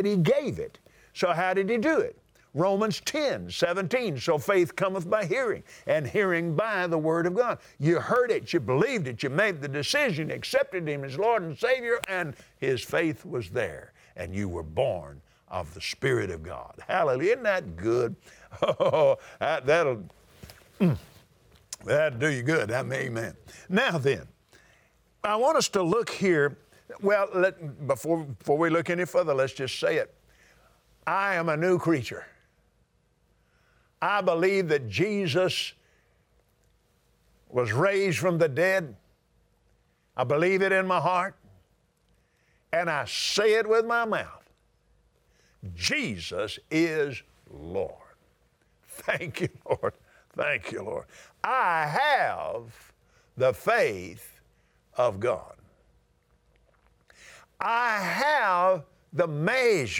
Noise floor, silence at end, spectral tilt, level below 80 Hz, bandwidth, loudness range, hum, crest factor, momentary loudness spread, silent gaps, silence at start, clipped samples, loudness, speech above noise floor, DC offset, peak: -68 dBFS; 0 s; -5 dB/octave; -62 dBFS; over 20 kHz; 5 LU; none; 18 dB; 12 LU; none; 0 s; under 0.1%; -27 LUFS; 41 dB; under 0.1%; -10 dBFS